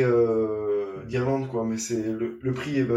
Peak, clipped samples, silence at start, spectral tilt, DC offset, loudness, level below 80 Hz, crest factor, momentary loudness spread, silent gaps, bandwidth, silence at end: -10 dBFS; under 0.1%; 0 s; -6.5 dB/octave; under 0.1%; -27 LUFS; -60 dBFS; 14 dB; 7 LU; none; 14 kHz; 0 s